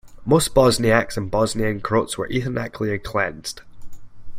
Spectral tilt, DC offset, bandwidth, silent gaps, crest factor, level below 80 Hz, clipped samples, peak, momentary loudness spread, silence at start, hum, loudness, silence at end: -5 dB/octave; under 0.1%; 16.5 kHz; none; 20 dB; -40 dBFS; under 0.1%; -2 dBFS; 10 LU; 0.05 s; none; -21 LUFS; 0 s